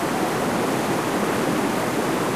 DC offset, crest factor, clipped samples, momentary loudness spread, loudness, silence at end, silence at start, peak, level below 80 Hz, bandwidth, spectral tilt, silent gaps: 0.2%; 12 dB; under 0.1%; 1 LU; -22 LUFS; 0 s; 0 s; -10 dBFS; -54 dBFS; 15.5 kHz; -4.5 dB/octave; none